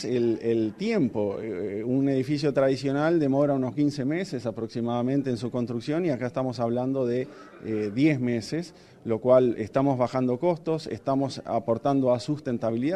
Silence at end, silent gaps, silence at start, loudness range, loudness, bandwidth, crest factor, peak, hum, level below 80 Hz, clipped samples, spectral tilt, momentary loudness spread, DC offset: 0 s; none; 0 s; 3 LU; -26 LUFS; 11 kHz; 18 dB; -8 dBFS; none; -62 dBFS; under 0.1%; -7.5 dB/octave; 8 LU; under 0.1%